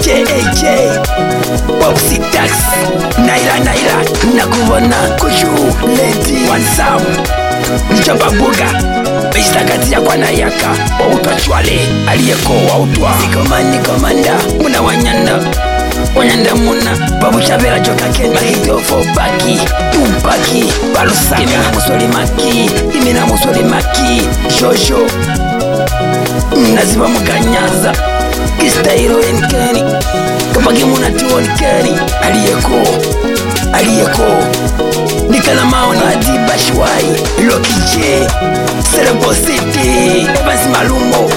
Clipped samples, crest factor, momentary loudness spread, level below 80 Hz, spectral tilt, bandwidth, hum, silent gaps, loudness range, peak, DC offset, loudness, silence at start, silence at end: under 0.1%; 10 dB; 4 LU; -20 dBFS; -4 dB/octave; 17 kHz; none; none; 1 LU; 0 dBFS; under 0.1%; -10 LUFS; 0 s; 0 s